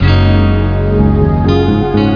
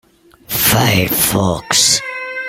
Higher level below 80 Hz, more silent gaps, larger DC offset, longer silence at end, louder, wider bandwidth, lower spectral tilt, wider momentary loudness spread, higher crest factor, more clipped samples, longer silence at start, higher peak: first, -18 dBFS vs -40 dBFS; neither; neither; about the same, 0 s vs 0 s; about the same, -11 LUFS vs -13 LUFS; second, 5.4 kHz vs over 20 kHz; first, -9.5 dB/octave vs -2.5 dB/octave; second, 3 LU vs 7 LU; second, 10 dB vs 16 dB; neither; second, 0 s vs 0.5 s; about the same, 0 dBFS vs 0 dBFS